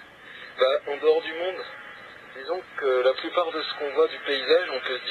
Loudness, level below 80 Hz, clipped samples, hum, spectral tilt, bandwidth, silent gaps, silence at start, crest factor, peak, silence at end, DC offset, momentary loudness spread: -25 LUFS; -72 dBFS; under 0.1%; none; -3.5 dB/octave; 7 kHz; none; 0 s; 18 dB; -8 dBFS; 0 s; under 0.1%; 18 LU